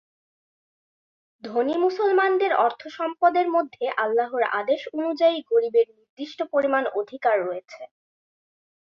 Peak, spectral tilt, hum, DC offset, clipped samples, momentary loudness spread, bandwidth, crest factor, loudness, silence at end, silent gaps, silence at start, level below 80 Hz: -6 dBFS; -5 dB/octave; none; under 0.1%; under 0.1%; 11 LU; 6.8 kHz; 18 dB; -23 LUFS; 1.15 s; 6.09-6.17 s; 1.45 s; -76 dBFS